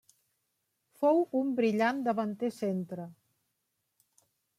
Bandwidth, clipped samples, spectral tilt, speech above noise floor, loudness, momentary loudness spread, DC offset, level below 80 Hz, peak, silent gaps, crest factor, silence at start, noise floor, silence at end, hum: 14.5 kHz; under 0.1%; -7 dB/octave; 52 dB; -30 LUFS; 13 LU; under 0.1%; -84 dBFS; -16 dBFS; none; 18 dB; 1 s; -81 dBFS; 1.45 s; none